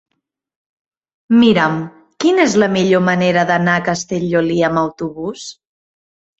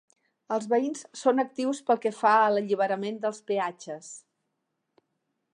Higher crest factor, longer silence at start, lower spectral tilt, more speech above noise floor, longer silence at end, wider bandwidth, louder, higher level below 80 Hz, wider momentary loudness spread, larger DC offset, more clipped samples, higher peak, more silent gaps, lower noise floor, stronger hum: about the same, 16 dB vs 18 dB; first, 1.3 s vs 0.5 s; about the same, -5.5 dB/octave vs -4.5 dB/octave; first, 59 dB vs 54 dB; second, 0.85 s vs 1.35 s; second, 8.2 kHz vs 11 kHz; first, -15 LUFS vs -27 LUFS; first, -54 dBFS vs -86 dBFS; second, 13 LU vs 17 LU; neither; neither; first, 0 dBFS vs -10 dBFS; neither; second, -73 dBFS vs -80 dBFS; neither